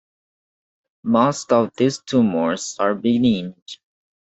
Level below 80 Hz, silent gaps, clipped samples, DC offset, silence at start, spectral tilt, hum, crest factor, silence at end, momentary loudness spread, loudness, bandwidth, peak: -60 dBFS; 3.62-3.66 s; under 0.1%; under 0.1%; 1.05 s; -5.5 dB/octave; none; 18 dB; 0.6 s; 16 LU; -19 LUFS; 8.2 kHz; -2 dBFS